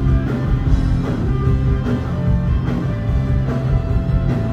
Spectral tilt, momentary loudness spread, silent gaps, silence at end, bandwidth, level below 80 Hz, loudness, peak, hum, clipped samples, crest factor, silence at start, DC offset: -9 dB/octave; 2 LU; none; 0 s; 7 kHz; -22 dBFS; -19 LUFS; -2 dBFS; none; under 0.1%; 14 dB; 0 s; under 0.1%